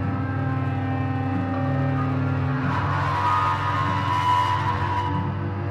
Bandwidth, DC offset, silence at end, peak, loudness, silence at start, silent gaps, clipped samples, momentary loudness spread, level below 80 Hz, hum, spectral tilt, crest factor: 9.4 kHz; under 0.1%; 0 s; -12 dBFS; -24 LUFS; 0 s; none; under 0.1%; 5 LU; -48 dBFS; none; -7.5 dB/octave; 12 dB